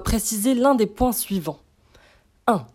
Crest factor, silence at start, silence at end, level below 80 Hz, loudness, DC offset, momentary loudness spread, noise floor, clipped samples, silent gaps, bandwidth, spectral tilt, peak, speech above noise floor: 16 dB; 0 s; 0.1 s; -38 dBFS; -21 LUFS; under 0.1%; 11 LU; -56 dBFS; under 0.1%; none; 16.5 kHz; -4.5 dB/octave; -6 dBFS; 35 dB